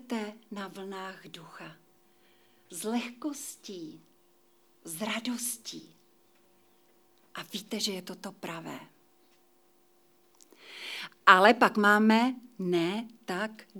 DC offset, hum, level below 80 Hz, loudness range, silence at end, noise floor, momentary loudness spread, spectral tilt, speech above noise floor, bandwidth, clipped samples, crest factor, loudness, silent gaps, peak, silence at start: under 0.1%; none; under -90 dBFS; 15 LU; 0 s; -66 dBFS; 25 LU; -3.5 dB/octave; 37 dB; over 20 kHz; under 0.1%; 30 dB; -28 LUFS; none; -2 dBFS; 0.1 s